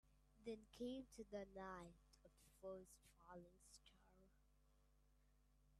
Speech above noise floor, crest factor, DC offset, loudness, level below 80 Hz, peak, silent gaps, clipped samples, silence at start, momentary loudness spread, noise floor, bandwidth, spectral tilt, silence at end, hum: 21 dB; 20 dB; under 0.1%; -57 LUFS; -76 dBFS; -40 dBFS; none; under 0.1%; 0.05 s; 15 LU; -78 dBFS; 13.5 kHz; -5 dB/octave; 0 s; none